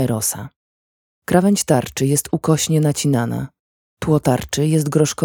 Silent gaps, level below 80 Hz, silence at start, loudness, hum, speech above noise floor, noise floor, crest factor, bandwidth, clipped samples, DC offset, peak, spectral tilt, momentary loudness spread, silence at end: 0.56-1.22 s, 3.60-3.97 s; -46 dBFS; 0 s; -18 LUFS; none; over 73 dB; under -90 dBFS; 18 dB; 20 kHz; under 0.1%; under 0.1%; 0 dBFS; -5.5 dB/octave; 12 LU; 0 s